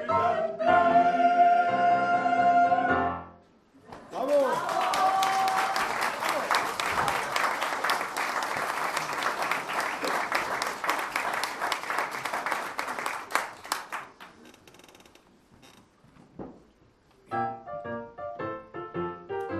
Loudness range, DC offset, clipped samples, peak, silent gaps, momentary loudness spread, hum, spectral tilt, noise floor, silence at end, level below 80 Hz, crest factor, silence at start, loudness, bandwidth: 15 LU; under 0.1%; under 0.1%; -4 dBFS; none; 15 LU; none; -3 dB/octave; -61 dBFS; 0 s; -64 dBFS; 24 dB; 0 s; -27 LUFS; 15 kHz